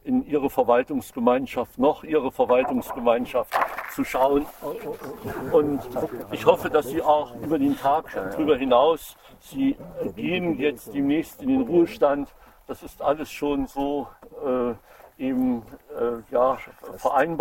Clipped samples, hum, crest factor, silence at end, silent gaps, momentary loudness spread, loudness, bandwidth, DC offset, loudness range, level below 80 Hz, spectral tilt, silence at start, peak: under 0.1%; none; 22 dB; 0 s; none; 12 LU; -24 LUFS; 17 kHz; under 0.1%; 4 LU; -52 dBFS; -6 dB/octave; 0.05 s; -2 dBFS